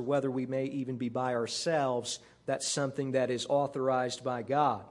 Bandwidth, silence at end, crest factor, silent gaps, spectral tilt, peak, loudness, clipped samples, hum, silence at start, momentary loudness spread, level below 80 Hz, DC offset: 11.5 kHz; 0 s; 18 dB; none; -4.5 dB/octave; -14 dBFS; -32 LUFS; under 0.1%; none; 0 s; 6 LU; -74 dBFS; under 0.1%